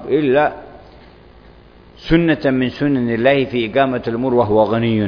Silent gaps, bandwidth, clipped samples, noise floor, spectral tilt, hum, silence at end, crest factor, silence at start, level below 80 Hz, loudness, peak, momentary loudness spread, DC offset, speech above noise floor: none; 5.4 kHz; under 0.1%; -43 dBFS; -9 dB/octave; none; 0 s; 16 dB; 0 s; -40 dBFS; -16 LUFS; 0 dBFS; 5 LU; under 0.1%; 28 dB